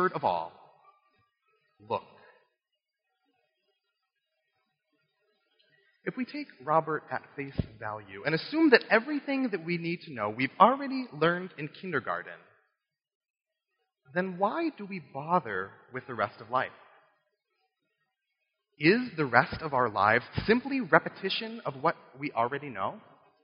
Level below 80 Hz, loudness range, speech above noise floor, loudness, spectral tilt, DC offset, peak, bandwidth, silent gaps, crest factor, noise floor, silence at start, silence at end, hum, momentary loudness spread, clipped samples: -60 dBFS; 17 LU; 56 dB; -29 LUFS; -3.5 dB/octave; under 0.1%; -4 dBFS; 5.4 kHz; 13.15-13.21 s, 13.30-13.34 s; 28 dB; -86 dBFS; 0 s; 0.45 s; none; 15 LU; under 0.1%